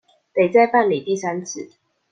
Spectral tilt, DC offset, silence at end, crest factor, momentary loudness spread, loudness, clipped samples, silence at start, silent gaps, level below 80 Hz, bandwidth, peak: -5 dB/octave; under 0.1%; 0.45 s; 18 dB; 18 LU; -19 LUFS; under 0.1%; 0.35 s; none; -68 dBFS; 9.2 kHz; -2 dBFS